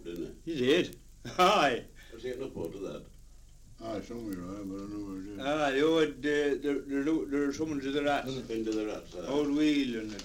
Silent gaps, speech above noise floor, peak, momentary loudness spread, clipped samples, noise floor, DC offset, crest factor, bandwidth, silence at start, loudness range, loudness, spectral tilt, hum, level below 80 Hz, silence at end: none; 22 dB; -12 dBFS; 14 LU; under 0.1%; -53 dBFS; under 0.1%; 20 dB; 16.5 kHz; 0 s; 10 LU; -31 LUFS; -5 dB/octave; none; -54 dBFS; 0 s